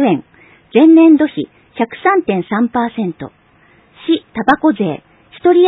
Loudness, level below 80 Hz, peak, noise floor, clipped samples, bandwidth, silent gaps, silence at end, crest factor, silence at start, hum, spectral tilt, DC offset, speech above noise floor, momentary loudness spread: -13 LUFS; -54 dBFS; 0 dBFS; -49 dBFS; under 0.1%; 4 kHz; none; 0 s; 14 dB; 0 s; none; -9 dB/octave; under 0.1%; 37 dB; 18 LU